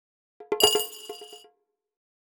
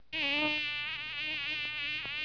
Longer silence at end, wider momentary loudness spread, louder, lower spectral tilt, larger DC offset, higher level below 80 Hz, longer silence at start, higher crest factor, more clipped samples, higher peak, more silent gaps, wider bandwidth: first, 1 s vs 0 s; first, 21 LU vs 6 LU; first, -23 LUFS vs -32 LUFS; second, -0.5 dB/octave vs -3 dB/octave; neither; about the same, -66 dBFS vs -66 dBFS; first, 0.4 s vs 0 s; first, 28 dB vs 16 dB; neither; first, -2 dBFS vs -18 dBFS; neither; first, over 20 kHz vs 5.4 kHz